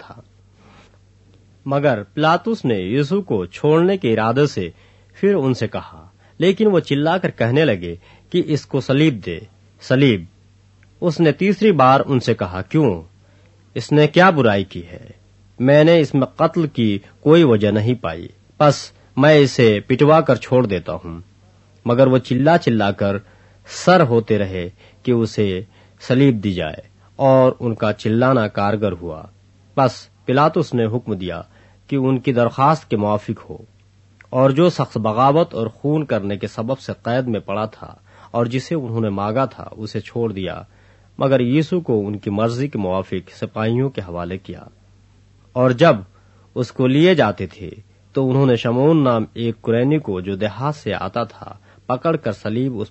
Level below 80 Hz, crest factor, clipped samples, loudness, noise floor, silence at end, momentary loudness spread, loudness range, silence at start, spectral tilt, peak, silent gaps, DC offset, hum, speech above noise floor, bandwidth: -52 dBFS; 18 dB; under 0.1%; -18 LUFS; -51 dBFS; 0.05 s; 15 LU; 6 LU; 0.1 s; -7 dB/octave; 0 dBFS; none; under 0.1%; none; 35 dB; 8.4 kHz